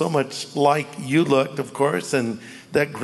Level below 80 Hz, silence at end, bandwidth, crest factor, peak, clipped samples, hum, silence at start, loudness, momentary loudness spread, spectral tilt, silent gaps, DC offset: -66 dBFS; 0 s; 12 kHz; 18 dB; -4 dBFS; under 0.1%; none; 0 s; -22 LUFS; 8 LU; -5.5 dB/octave; none; under 0.1%